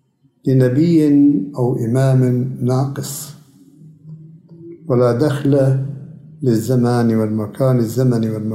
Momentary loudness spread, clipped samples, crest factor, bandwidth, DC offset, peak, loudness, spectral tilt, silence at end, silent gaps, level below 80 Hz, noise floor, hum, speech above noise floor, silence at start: 12 LU; under 0.1%; 14 dB; 15.5 kHz; under 0.1%; -2 dBFS; -16 LUFS; -8 dB/octave; 0 s; none; -58 dBFS; -44 dBFS; none; 29 dB; 0.45 s